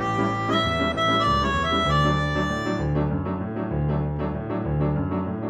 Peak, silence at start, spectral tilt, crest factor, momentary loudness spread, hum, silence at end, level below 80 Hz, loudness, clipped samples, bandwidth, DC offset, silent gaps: -10 dBFS; 0 s; -6.5 dB/octave; 14 dB; 7 LU; none; 0 s; -36 dBFS; -24 LUFS; under 0.1%; 9 kHz; under 0.1%; none